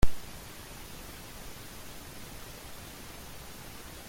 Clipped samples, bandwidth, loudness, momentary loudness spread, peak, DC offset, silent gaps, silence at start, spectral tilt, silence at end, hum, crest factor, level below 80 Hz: under 0.1%; 16.5 kHz; -44 LUFS; 0 LU; -10 dBFS; under 0.1%; none; 0 s; -4 dB/octave; 0 s; none; 22 dB; -42 dBFS